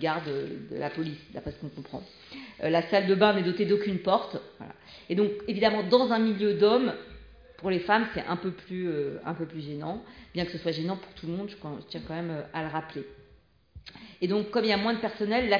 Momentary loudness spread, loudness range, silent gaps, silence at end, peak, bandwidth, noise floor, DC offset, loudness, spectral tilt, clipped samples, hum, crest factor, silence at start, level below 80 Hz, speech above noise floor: 19 LU; 9 LU; none; 0 s; -8 dBFS; 5.2 kHz; -60 dBFS; under 0.1%; -28 LUFS; -7.5 dB/octave; under 0.1%; none; 22 dB; 0 s; -58 dBFS; 32 dB